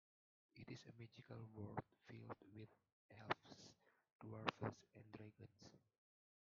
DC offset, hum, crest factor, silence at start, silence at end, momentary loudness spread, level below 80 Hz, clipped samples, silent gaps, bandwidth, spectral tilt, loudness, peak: under 0.1%; none; 36 dB; 0.55 s; 0.8 s; 17 LU; -84 dBFS; under 0.1%; 2.92-3.09 s, 4.12-4.19 s; 7.2 kHz; -4 dB/octave; -54 LUFS; -20 dBFS